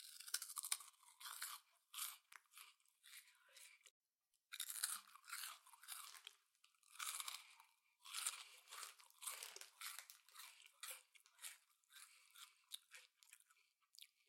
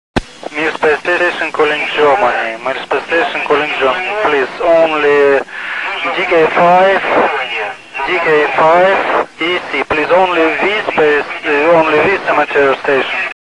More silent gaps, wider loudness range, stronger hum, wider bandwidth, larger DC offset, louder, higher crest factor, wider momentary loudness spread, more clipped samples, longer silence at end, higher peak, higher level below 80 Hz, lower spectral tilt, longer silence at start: first, 3.90-4.01 s, 4.15-4.19 s vs none; first, 8 LU vs 2 LU; neither; first, 16.5 kHz vs 11 kHz; second, under 0.1% vs 0.3%; second, -51 LUFS vs -12 LUFS; first, 34 dB vs 12 dB; first, 19 LU vs 8 LU; neither; first, 0.25 s vs 0.05 s; second, -22 dBFS vs 0 dBFS; second, under -90 dBFS vs -44 dBFS; second, 6 dB/octave vs -4.5 dB/octave; second, 0 s vs 0.15 s